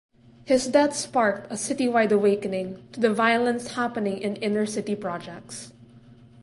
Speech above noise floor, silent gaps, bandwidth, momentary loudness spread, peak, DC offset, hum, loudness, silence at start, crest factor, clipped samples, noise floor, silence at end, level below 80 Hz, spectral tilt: 26 dB; none; 11.5 kHz; 15 LU; -6 dBFS; under 0.1%; none; -24 LUFS; 0.45 s; 18 dB; under 0.1%; -50 dBFS; 0.3 s; -64 dBFS; -4.5 dB/octave